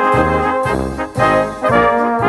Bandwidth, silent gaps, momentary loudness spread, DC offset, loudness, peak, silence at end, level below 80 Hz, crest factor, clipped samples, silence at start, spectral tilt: 12 kHz; none; 6 LU; under 0.1%; -15 LUFS; 0 dBFS; 0 s; -32 dBFS; 14 dB; under 0.1%; 0 s; -6.5 dB/octave